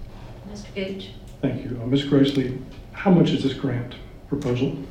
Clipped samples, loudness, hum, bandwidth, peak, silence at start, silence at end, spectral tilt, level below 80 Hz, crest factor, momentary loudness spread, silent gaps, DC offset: under 0.1%; -23 LUFS; none; 9.8 kHz; -6 dBFS; 0 s; 0 s; -7.5 dB/octave; -44 dBFS; 18 dB; 20 LU; none; under 0.1%